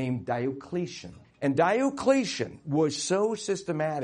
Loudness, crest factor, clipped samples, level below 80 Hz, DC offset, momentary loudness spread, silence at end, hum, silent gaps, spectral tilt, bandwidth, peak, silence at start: -28 LUFS; 18 dB; under 0.1%; -64 dBFS; under 0.1%; 9 LU; 0 s; none; none; -5 dB/octave; 10.5 kHz; -10 dBFS; 0 s